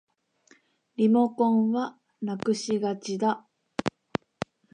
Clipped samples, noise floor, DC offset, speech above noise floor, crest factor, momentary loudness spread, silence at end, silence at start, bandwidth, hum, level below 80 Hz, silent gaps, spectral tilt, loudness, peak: under 0.1%; -62 dBFS; under 0.1%; 37 dB; 18 dB; 14 LU; 0.85 s; 1 s; 10 kHz; none; -66 dBFS; none; -6 dB/octave; -27 LUFS; -10 dBFS